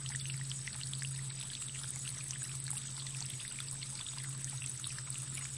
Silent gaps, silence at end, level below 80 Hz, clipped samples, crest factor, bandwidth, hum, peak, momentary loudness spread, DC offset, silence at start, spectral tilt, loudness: none; 0 s; -68 dBFS; under 0.1%; 22 dB; 11.5 kHz; none; -20 dBFS; 1 LU; under 0.1%; 0 s; -2 dB/octave; -40 LUFS